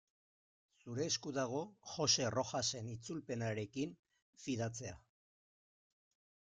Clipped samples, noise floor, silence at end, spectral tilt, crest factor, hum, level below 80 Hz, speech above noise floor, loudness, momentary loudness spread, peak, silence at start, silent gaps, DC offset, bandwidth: under 0.1%; under -90 dBFS; 1.6 s; -3.5 dB/octave; 22 dB; none; -74 dBFS; over 50 dB; -39 LUFS; 15 LU; -20 dBFS; 0.85 s; 3.99-4.03 s, 4.22-4.33 s; under 0.1%; 11 kHz